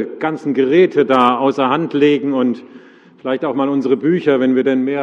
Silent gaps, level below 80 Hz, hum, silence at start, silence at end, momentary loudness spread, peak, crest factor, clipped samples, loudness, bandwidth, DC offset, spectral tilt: none; -64 dBFS; none; 0 s; 0 s; 8 LU; 0 dBFS; 16 dB; under 0.1%; -15 LUFS; 7.2 kHz; under 0.1%; -7.5 dB/octave